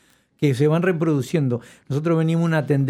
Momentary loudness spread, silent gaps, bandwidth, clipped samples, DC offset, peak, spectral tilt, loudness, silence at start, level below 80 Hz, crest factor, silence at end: 7 LU; none; 13 kHz; under 0.1%; under 0.1%; -6 dBFS; -8 dB/octave; -21 LUFS; 0.4 s; -64 dBFS; 14 dB; 0 s